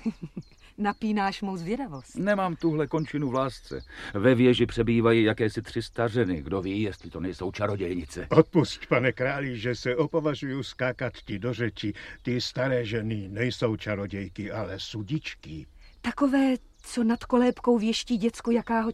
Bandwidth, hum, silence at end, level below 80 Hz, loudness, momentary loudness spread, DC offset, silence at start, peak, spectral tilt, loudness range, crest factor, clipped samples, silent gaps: 12.5 kHz; none; 0 s; -50 dBFS; -27 LUFS; 12 LU; under 0.1%; 0 s; -4 dBFS; -6.5 dB/octave; 5 LU; 22 dB; under 0.1%; none